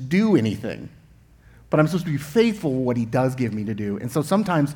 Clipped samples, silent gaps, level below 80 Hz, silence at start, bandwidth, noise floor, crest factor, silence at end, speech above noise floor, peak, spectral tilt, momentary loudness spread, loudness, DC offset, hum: under 0.1%; none; -54 dBFS; 0 s; 19 kHz; -51 dBFS; 16 dB; 0 s; 30 dB; -6 dBFS; -7 dB/octave; 9 LU; -22 LUFS; under 0.1%; none